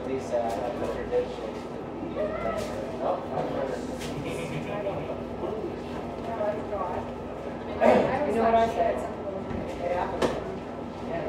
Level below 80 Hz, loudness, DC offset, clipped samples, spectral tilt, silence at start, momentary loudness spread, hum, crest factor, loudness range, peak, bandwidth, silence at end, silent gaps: -50 dBFS; -29 LUFS; under 0.1%; under 0.1%; -6.5 dB/octave; 0 s; 12 LU; none; 22 dB; 6 LU; -6 dBFS; 15.5 kHz; 0 s; none